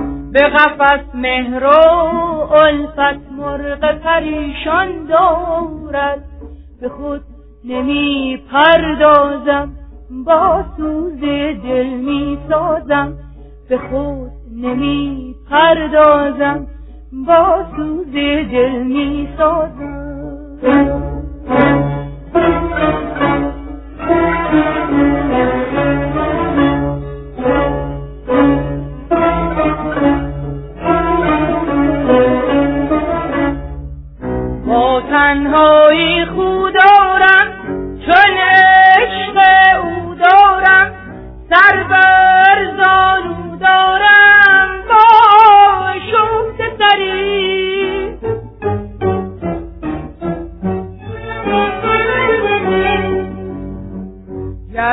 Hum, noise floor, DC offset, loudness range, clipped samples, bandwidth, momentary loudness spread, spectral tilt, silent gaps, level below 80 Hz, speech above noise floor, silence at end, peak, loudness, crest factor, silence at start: none; -33 dBFS; under 0.1%; 10 LU; 0.1%; 5.4 kHz; 17 LU; -8 dB/octave; none; -32 dBFS; 19 dB; 0 s; 0 dBFS; -12 LUFS; 12 dB; 0 s